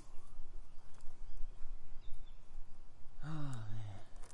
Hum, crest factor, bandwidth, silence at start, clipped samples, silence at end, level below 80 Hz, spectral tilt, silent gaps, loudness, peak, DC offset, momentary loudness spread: none; 12 dB; 4.9 kHz; 0 s; under 0.1%; 0 s; -46 dBFS; -6.5 dB/octave; none; -52 LUFS; -24 dBFS; under 0.1%; 15 LU